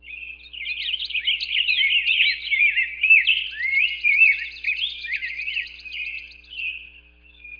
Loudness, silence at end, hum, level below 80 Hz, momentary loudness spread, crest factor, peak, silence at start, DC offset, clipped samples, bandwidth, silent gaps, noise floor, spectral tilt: -19 LUFS; 0.05 s; none; -56 dBFS; 17 LU; 18 dB; -6 dBFS; 0.05 s; under 0.1%; under 0.1%; 5.2 kHz; none; -50 dBFS; 0.5 dB/octave